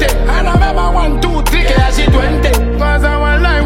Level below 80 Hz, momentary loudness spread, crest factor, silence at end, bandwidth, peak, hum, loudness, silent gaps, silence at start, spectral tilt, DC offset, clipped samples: -12 dBFS; 3 LU; 10 dB; 0 s; 16.5 kHz; 0 dBFS; none; -12 LUFS; none; 0 s; -5.5 dB/octave; under 0.1%; under 0.1%